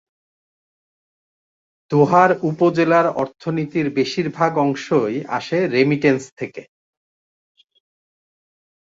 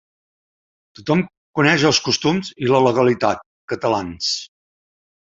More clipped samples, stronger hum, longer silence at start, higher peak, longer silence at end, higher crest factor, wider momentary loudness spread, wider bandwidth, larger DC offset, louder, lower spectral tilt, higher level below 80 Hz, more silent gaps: neither; neither; first, 1.9 s vs 1 s; about the same, -2 dBFS vs 0 dBFS; first, 2.2 s vs 0.75 s; about the same, 18 dB vs 20 dB; about the same, 10 LU vs 11 LU; about the same, 7.8 kHz vs 8 kHz; neither; about the same, -18 LUFS vs -18 LUFS; first, -6.5 dB/octave vs -4.5 dB/octave; second, -64 dBFS vs -54 dBFS; second, 6.32-6.37 s vs 1.37-1.54 s, 3.46-3.68 s